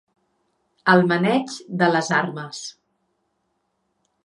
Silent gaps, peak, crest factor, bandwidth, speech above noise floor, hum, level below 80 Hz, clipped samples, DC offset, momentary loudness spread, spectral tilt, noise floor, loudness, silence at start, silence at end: none; -2 dBFS; 22 dB; 11 kHz; 52 dB; none; -72 dBFS; under 0.1%; under 0.1%; 16 LU; -5.5 dB/octave; -72 dBFS; -20 LUFS; 0.85 s; 1.55 s